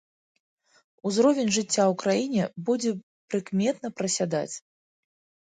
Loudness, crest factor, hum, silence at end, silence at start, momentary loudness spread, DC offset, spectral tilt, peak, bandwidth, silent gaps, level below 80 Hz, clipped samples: -26 LUFS; 18 dB; none; 0.9 s; 1.05 s; 11 LU; under 0.1%; -4.5 dB/octave; -10 dBFS; 9.6 kHz; 3.03-3.28 s; -72 dBFS; under 0.1%